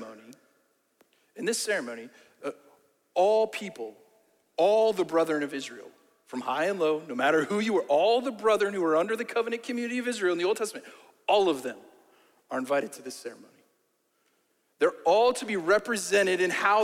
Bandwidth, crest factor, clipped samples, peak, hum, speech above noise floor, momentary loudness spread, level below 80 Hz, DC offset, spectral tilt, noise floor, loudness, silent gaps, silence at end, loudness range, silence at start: 16 kHz; 18 dB; under 0.1%; -10 dBFS; none; 46 dB; 16 LU; -76 dBFS; under 0.1%; -3.5 dB/octave; -73 dBFS; -27 LUFS; none; 0 s; 5 LU; 0 s